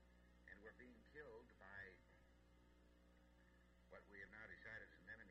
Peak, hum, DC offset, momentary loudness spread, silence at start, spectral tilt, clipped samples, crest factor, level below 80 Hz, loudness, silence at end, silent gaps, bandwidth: -46 dBFS; 60 Hz at -75 dBFS; under 0.1%; 8 LU; 0 s; -3.5 dB/octave; under 0.1%; 18 dB; -74 dBFS; -61 LUFS; 0 s; none; 8 kHz